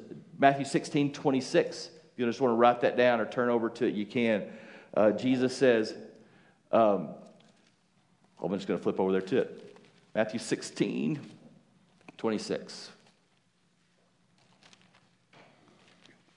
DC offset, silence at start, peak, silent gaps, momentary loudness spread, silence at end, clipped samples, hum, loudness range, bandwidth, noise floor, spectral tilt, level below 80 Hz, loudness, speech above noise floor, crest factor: under 0.1%; 0 s; -6 dBFS; none; 18 LU; 3.45 s; under 0.1%; none; 13 LU; 11 kHz; -70 dBFS; -5.5 dB/octave; -84 dBFS; -29 LUFS; 42 dB; 24 dB